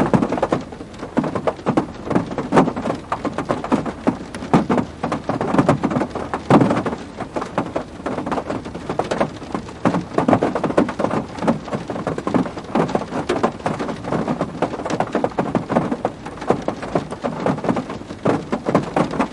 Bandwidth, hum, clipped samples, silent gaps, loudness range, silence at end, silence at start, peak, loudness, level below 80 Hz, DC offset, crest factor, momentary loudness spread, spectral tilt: 11.5 kHz; none; under 0.1%; none; 3 LU; 0 s; 0 s; 0 dBFS; -21 LUFS; -46 dBFS; under 0.1%; 20 dB; 9 LU; -7 dB/octave